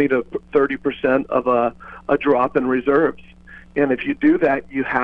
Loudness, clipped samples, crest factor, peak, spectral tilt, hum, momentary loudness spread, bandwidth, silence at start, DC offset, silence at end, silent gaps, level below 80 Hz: -19 LUFS; under 0.1%; 16 dB; -2 dBFS; -8.5 dB/octave; none; 5 LU; 5 kHz; 0 s; under 0.1%; 0 s; none; -50 dBFS